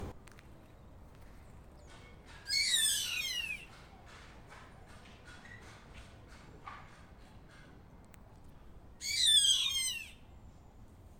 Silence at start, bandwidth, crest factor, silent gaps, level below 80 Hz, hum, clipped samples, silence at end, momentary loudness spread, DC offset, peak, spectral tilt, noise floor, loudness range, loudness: 0 s; 18 kHz; 22 dB; none; -58 dBFS; none; under 0.1%; 0.05 s; 29 LU; under 0.1%; -16 dBFS; 0.5 dB/octave; -56 dBFS; 22 LU; -30 LUFS